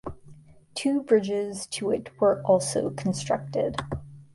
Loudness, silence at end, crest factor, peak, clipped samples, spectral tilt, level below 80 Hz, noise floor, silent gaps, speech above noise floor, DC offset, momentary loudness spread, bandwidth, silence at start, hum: -26 LUFS; 0.1 s; 18 dB; -8 dBFS; under 0.1%; -5 dB/octave; -52 dBFS; -50 dBFS; none; 25 dB; under 0.1%; 12 LU; 11.5 kHz; 0.05 s; none